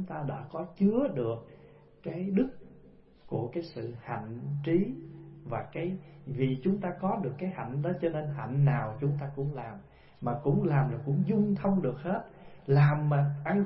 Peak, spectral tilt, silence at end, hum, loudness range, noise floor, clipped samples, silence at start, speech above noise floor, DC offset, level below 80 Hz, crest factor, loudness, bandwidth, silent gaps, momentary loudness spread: -14 dBFS; -12.5 dB/octave; 0 s; none; 7 LU; -56 dBFS; under 0.1%; 0 s; 26 dB; under 0.1%; -58 dBFS; 18 dB; -31 LUFS; 5.6 kHz; none; 13 LU